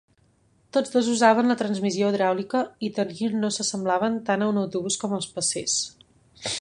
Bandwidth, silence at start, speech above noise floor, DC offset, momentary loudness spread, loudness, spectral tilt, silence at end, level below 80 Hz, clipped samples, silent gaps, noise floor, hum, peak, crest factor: 11.5 kHz; 0.75 s; 39 dB; under 0.1%; 9 LU; -24 LUFS; -3.5 dB/octave; 0 s; -66 dBFS; under 0.1%; none; -63 dBFS; none; -4 dBFS; 20 dB